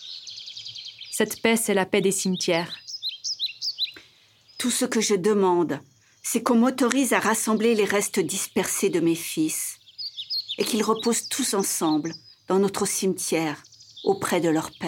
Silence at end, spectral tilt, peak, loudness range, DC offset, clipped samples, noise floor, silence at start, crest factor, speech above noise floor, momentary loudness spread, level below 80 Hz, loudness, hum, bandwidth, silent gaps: 0 s; -3.5 dB/octave; -2 dBFS; 3 LU; under 0.1%; under 0.1%; -56 dBFS; 0 s; 22 dB; 33 dB; 13 LU; -70 dBFS; -24 LUFS; none; 17.5 kHz; none